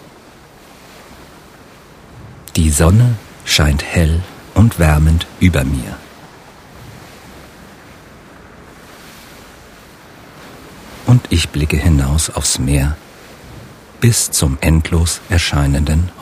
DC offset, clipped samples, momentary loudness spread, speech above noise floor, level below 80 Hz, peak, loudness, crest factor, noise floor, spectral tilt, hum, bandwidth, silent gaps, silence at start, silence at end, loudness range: under 0.1%; under 0.1%; 25 LU; 28 dB; -24 dBFS; 0 dBFS; -14 LUFS; 16 dB; -41 dBFS; -5 dB/octave; none; 16 kHz; none; 1.1 s; 0 s; 8 LU